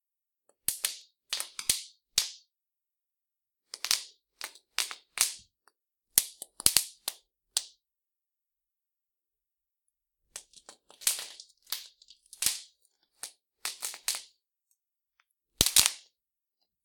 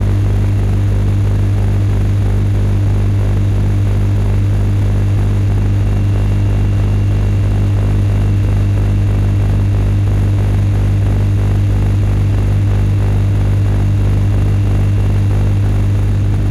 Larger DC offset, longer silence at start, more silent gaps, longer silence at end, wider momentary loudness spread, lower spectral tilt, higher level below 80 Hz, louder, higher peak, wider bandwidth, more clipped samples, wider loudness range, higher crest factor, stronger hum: neither; first, 0.7 s vs 0 s; neither; first, 0.85 s vs 0 s; first, 22 LU vs 1 LU; second, 1 dB/octave vs -8.5 dB/octave; second, -60 dBFS vs -18 dBFS; second, -30 LUFS vs -14 LUFS; first, 0 dBFS vs -4 dBFS; first, 19 kHz vs 11 kHz; neither; first, 8 LU vs 0 LU; first, 36 dB vs 8 dB; second, none vs 50 Hz at -15 dBFS